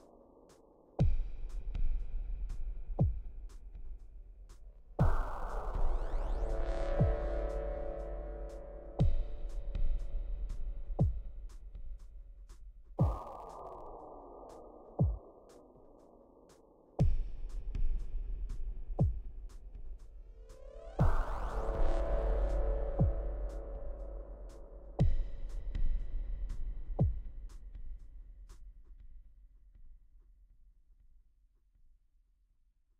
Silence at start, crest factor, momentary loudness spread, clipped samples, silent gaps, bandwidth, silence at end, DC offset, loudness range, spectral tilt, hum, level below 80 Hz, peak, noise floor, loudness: 1 s; 18 dB; 22 LU; under 0.1%; none; 5.2 kHz; 2.05 s; under 0.1%; 6 LU; -9 dB/octave; none; -38 dBFS; -18 dBFS; -71 dBFS; -39 LUFS